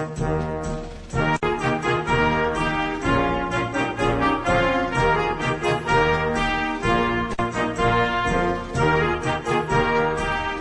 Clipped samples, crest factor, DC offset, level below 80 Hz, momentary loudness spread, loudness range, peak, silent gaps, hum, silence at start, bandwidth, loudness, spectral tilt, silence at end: under 0.1%; 14 dB; under 0.1%; -36 dBFS; 5 LU; 1 LU; -6 dBFS; none; none; 0 s; 10.5 kHz; -22 LUFS; -5.5 dB/octave; 0 s